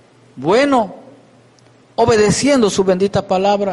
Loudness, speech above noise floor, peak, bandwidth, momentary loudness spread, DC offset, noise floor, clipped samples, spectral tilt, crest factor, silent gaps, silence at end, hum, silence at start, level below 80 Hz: -15 LUFS; 35 dB; -4 dBFS; 11.5 kHz; 8 LU; under 0.1%; -48 dBFS; under 0.1%; -5 dB/octave; 12 dB; none; 0 s; none; 0.35 s; -46 dBFS